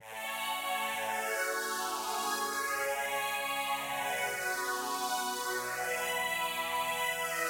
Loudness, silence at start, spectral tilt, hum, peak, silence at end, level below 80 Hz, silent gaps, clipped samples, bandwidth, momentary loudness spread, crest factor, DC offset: -33 LUFS; 0 s; -0.5 dB/octave; none; -20 dBFS; 0 s; -72 dBFS; none; under 0.1%; 17 kHz; 2 LU; 14 dB; under 0.1%